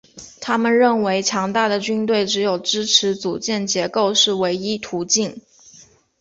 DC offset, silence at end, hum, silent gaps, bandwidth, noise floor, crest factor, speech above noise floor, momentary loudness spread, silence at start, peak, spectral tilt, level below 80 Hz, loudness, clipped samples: under 0.1%; 0.8 s; none; none; 8.2 kHz; -49 dBFS; 18 dB; 30 dB; 8 LU; 0.15 s; -2 dBFS; -2.5 dB/octave; -62 dBFS; -18 LUFS; under 0.1%